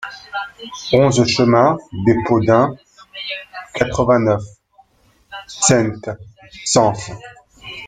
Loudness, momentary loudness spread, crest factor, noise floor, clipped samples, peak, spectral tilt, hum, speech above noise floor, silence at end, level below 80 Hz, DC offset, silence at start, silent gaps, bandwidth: -16 LUFS; 20 LU; 18 dB; -56 dBFS; under 0.1%; 0 dBFS; -4.5 dB/octave; none; 40 dB; 0 s; -46 dBFS; under 0.1%; 0 s; none; 9.6 kHz